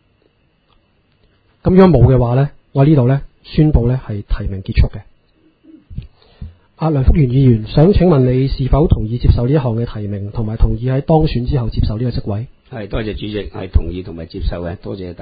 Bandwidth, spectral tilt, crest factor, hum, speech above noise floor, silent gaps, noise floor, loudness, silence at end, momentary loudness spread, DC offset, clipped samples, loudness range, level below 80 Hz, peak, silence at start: 5 kHz; -12 dB/octave; 14 dB; none; 44 dB; none; -57 dBFS; -15 LUFS; 0.05 s; 14 LU; under 0.1%; 0.1%; 8 LU; -22 dBFS; 0 dBFS; 1.65 s